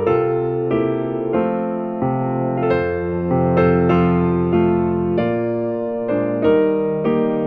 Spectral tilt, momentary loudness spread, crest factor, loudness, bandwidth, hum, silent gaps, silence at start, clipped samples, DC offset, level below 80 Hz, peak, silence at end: -10.5 dB/octave; 6 LU; 14 dB; -18 LUFS; 5 kHz; none; none; 0 s; under 0.1%; 0.2%; -44 dBFS; -4 dBFS; 0 s